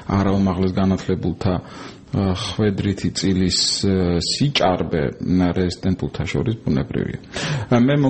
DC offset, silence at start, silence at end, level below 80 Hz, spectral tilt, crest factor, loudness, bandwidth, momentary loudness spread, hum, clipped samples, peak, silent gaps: 0.2%; 0 s; 0 s; -40 dBFS; -5.5 dB/octave; 18 dB; -20 LUFS; 8.8 kHz; 7 LU; none; under 0.1%; -2 dBFS; none